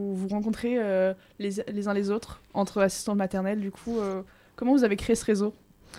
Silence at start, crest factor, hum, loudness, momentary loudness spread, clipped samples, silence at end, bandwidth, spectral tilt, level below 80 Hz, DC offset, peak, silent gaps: 0 s; 18 dB; none; -28 LUFS; 9 LU; under 0.1%; 0 s; 15.5 kHz; -5.5 dB/octave; -54 dBFS; under 0.1%; -10 dBFS; none